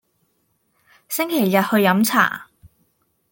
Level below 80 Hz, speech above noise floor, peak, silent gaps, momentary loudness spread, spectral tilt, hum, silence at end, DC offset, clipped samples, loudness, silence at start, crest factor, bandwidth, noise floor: -64 dBFS; 50 dB; -2 dBFS; none; 10 LU; -4.5 dB/octave; none; 0.9 s; under 0.1%; under 0.1%; -18 LUFS; 1.1 s; 20 dB; 17 kHz; -67 dBFS